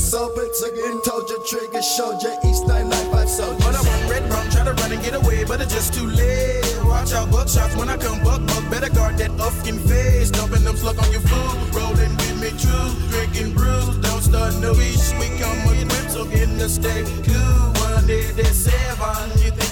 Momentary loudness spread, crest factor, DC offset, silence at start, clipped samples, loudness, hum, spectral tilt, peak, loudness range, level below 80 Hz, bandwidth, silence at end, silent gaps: 5 LU; 12 dB; under 0.1%; 0 s; under 0.1%; -20 LUFS; none; -4.5 dB/octave; -6 dBFS; 1 LU; -20 dBFS; 19 kHz; 0 s; none